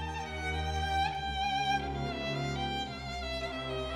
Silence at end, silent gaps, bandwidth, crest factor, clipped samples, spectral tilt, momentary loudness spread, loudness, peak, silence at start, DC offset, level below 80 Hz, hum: 0 s; none; 13.5 kHz; 16 dB; under 0.1%; -4.5 dB/octave; 6 LU; -34 LUFS; -18 dBFS; 0 s; under 0.1%; -44 dBFS; none